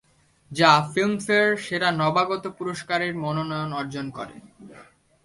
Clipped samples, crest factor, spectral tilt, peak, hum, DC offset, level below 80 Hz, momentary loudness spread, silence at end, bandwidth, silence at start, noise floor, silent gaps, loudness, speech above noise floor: under 0.1%; 22 dB; -5 dB/octave; -2 dBFS; none; under 0.1%; -62 dBFS; 15 LU; 0.4 s; 11.5 kHz; 0.5 s; -51 dBFS; none; -23 LUFS; 28 dB